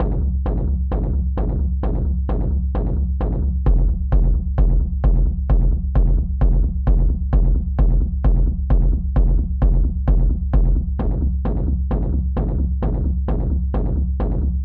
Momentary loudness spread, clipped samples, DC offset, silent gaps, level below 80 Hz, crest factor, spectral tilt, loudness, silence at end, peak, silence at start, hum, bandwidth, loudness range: 3 LU; under 0.1%; under 0.1%; none; -18 dBFS; 10 dB; -12.5 dB/octave; -21 LUFS; 0 s; -6 dBFS; 0 s; none; 2 kHz; 2 LU